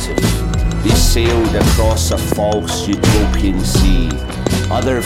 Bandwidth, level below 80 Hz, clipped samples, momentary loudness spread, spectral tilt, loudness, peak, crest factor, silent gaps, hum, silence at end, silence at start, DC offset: 16.5 kHz; -18 dBFS; under 0.1%; 5 LU; -5 dB/octave; -15 LUFS; 0 dBFS; 14 dB; none; none; 0 s; 0 s; under 0.1%